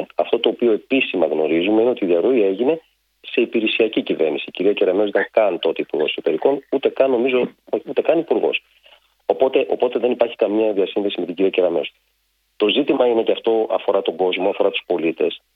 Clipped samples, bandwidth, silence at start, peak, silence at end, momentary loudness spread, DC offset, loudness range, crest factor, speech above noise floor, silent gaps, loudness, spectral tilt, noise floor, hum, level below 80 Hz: under 0.1%; 4.8 kHz; 0 s; 0 dBFS; 0.2 s; 5 LU; under 0.1%; 2 LU; 18 dB; 48 dB; none; -19 LUFS; -7 dB/octave; -67 dBFS; none; -68 dBFS